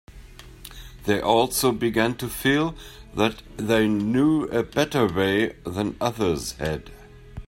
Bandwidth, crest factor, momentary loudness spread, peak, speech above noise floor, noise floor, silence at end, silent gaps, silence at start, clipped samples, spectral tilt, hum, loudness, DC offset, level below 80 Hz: 16.5 kHz; 20 dB; 14 LU; -4 dBFS; 21 dB; -44 dBFS; 0 s; none; 0.1 s; under 0.1%; -5 dB/octave; none; -23 LUFS; under 0.1%; -46 dBFS